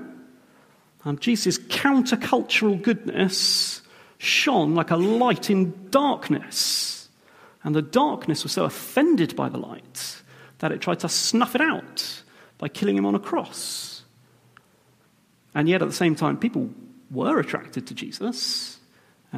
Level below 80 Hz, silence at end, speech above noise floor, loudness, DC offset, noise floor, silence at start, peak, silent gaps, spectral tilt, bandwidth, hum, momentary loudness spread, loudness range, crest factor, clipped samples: -70 dBFS; 0 s; 38 dB; -23 LUFS; under 0.1%; -61 dBFS; 0 s; -4 dBFS; none; -4 dB/octave; 15.5 kHz; none; 14 LU; 6 LU; 20 dB; under 0.1%